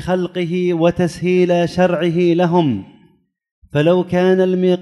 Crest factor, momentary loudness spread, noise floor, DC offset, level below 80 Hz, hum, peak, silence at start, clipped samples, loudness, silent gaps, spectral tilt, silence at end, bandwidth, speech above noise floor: 14 dB; 6 LU; -55 dBFS; under 0.1%; -48 dBFS; none; -2 dBFS; 0 s; under 0.1%; -16 LUFS; 3.51-3.62 s; -7.5 dB/octave; 0 s; 11.5 kHz; 40 dB